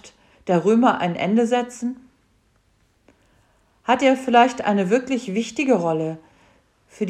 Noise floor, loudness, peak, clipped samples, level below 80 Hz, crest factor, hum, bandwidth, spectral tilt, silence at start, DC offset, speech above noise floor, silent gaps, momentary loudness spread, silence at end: -62 dBFS; -20 LUFS; -4 dBFS; under 0.1%; -64 dBFS; 18 dB; none; 10.5 kHz; -5.5 dB/octave; 0.05 s; under 0.1%; 43 dB; none; 14 LU; 0 s